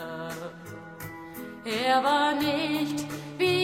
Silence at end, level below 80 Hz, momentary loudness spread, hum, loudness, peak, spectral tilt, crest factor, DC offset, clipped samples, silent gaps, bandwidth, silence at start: 0 s; -66 dBFS; 17 LU; none; -27 LUFS; -12 dBFS; -4.5 dB/octave; 18 dB; under 0.1%; under 0.1%; none; 16.5 kHz; 0 s